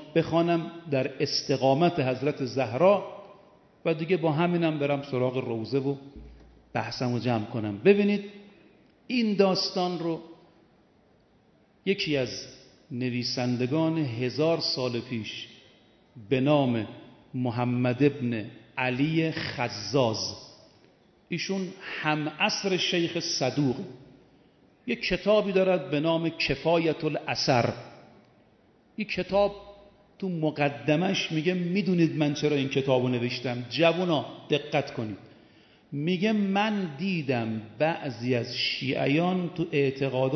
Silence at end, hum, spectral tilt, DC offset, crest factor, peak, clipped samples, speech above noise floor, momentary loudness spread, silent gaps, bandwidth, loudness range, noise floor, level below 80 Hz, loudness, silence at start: 0 s; none; -6 dB/octave; under 0.1%; 20 dB; -8 dBFS; under 0.1%; 36 dB; 11 LU; none; 6.4 kHz; 4 LU; -62 dBFS; -60 dBFS; -27 LUFS; 0 s